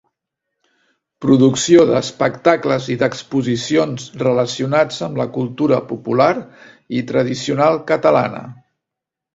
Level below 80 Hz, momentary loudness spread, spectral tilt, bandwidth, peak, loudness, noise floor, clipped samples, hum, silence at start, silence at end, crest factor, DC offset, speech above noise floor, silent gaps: -56 dBFS; 10 LU; -5.5 dB/octave; 8 kHz; 0 dBFS; -16 LUFS; -84 dBFS; under 0.1%; none; 1.2 s; 0.8 s; 18 dB; under 0.1%; 68 dB; none